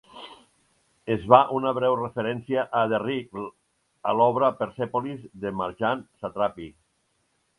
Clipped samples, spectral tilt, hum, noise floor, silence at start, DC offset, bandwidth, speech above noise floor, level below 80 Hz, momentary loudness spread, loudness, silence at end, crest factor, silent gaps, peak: under 0.1%; -7.5 dB/octave; none; -71 dBFS; 0.15 s; under 0.1%; 11 kHz; 47 dB; -60 dBFS; 21 LU; -25 LUFS; 0.9 s; 24 dB; none; -2 dBFS